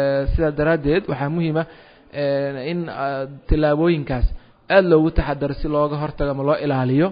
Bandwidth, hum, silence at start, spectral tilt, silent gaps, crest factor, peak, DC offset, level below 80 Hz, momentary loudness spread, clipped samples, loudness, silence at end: 5.2 kHz; none; 0 s; -12 dB/octave; none; 18 dB; -2 dBFS; under 0.1%; -30 dBFS; 9 LU; under 0.1%; -20 LUFS; 0 s